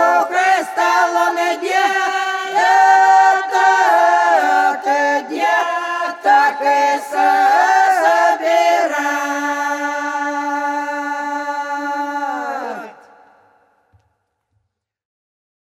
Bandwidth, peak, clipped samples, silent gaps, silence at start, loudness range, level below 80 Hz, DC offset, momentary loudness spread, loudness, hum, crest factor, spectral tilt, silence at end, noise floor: 14.5 kHz; -2 dBFS; under 0.1%; none; 0 s; 12 LU; -76 dBFS; under 0.1%; 10 LU; -15 LUFS; none; 14 dB; -1 dB/octave; 2.7 s; -70 dBFS